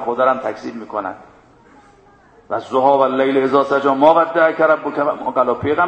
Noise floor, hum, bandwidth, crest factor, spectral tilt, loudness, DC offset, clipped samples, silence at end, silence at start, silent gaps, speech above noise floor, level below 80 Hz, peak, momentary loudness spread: -49 dBFS; none; 8.4 kHz; 16 dB; -6.5 dB/octave; -16 LUFS; under 0.1%; under 0.1%; 0 s; 0 s; none; 33 dB; -58 dBFS; 0 dBFS; 13 LU